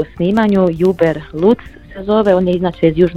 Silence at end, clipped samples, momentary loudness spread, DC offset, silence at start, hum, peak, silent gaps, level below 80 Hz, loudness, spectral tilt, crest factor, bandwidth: 0 s; under 0.1%; 5 LU; under 0.1%; 0 s; none; 0 dBFS; none; -38 dBFS; -14 LUFS; -8.5 dB/octave; 14 dB; 8.2 kHz